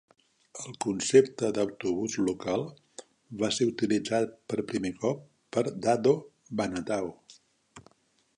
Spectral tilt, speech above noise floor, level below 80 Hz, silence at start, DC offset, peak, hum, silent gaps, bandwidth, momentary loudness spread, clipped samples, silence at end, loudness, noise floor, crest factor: -5 dB/octave; 40 dB; -66 dBFS; 0.55 s; under 0.1%; -8 dBFS; none; none; 11 kHz; 18 LU; under 0.1%; 0.55 s; -29 LUFS; -69 dBFS; 22 dB